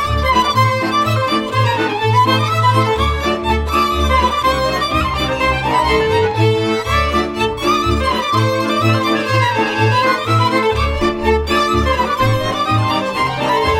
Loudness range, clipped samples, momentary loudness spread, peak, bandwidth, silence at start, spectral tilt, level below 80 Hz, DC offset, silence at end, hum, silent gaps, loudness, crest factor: 1 LU; under 0.1%; 3 LU; 0 dBFS; 16 kHz; 0 s; -5.5 dB/octave; -26 dBFS; under 0.1%; 0 s; none; none; -15 LUFS; 14 dB